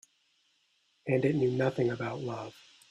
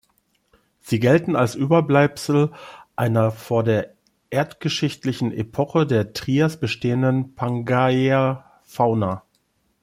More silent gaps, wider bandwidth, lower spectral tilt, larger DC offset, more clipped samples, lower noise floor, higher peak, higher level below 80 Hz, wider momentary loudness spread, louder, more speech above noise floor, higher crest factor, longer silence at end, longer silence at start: neither; second, 10 kHz vs 15.5 kHz; about the same, -7.5 dB/octave vs -7 dB/octave; neither; neither; first, -72 dBFS vs -67 dBFS; second, -14 dBFS vs -4 dBFS; second, -68 dBFS vs -58 dBFS; first, 14 LU vs 8 LU; second, -31 LUFS vs -21 LUFS; second, 42 dB vs 47 dB; about the same, 18 dB vs 18 dB; second, 0.4 s vs 0.65 s; first, 1.05 s vs 0.85 s